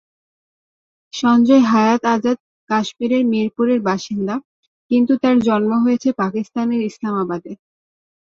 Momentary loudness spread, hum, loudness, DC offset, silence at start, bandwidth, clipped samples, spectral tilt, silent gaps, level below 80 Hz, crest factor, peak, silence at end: 11 LU; none; -17 LUFS; under 0.1%; 1.15 s; 7.2 kHz; under 0.1%; -6 dB/octave; 2.40-2.67 s, 4.45-4.90 s; -62 dBFS; 16 dB; -2 dBFS; 0.75 s